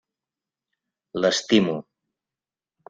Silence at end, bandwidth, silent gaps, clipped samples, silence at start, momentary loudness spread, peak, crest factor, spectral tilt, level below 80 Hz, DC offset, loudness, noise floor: 1.1 s; 9 kHz; none; under 0.1%; 1.15 s; 14 LU; -6 dBFS; 22 dB; -4.5 dB/octave; -66 dBFS; under 0.1%; -22 LUFS; under -90 dBFS